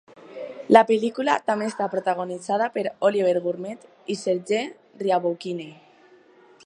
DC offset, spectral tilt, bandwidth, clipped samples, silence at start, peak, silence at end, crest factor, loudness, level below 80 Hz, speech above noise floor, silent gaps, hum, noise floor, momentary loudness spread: under 0.1%; -5 dB/octave; 11 kHz; under 0.1%; 0.15 s; -2 dBFS; 0.95 s; 24 dB; -23 LUFS; -76 dBFS; 31 dB; none; none; -54 dBFS; 19 LU